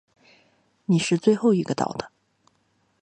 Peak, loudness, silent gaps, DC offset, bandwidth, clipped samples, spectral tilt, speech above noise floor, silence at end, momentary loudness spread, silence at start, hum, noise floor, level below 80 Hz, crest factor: -6 dBFS; -23 LUFS; none; under 0.1%; 9.8 kHz; under 0.1%; -6 dB/octave; 46 dB; 0.95 s; 17 LU; 0.9 s; none; -68 dBFS; -66 dBFS; 20 dB